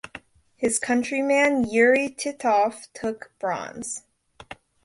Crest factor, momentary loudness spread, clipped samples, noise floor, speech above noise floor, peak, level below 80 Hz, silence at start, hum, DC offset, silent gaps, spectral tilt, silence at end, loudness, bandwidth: 18 dB; 21 LU; under 0.1%; -47 dBFS; 23 dB; -6 dBFS; -60 dBFS; 0.05 s; none; under 0.1%; none; -3 dB/octave; 0.3 s; -23 LUFS; 11.5 kHz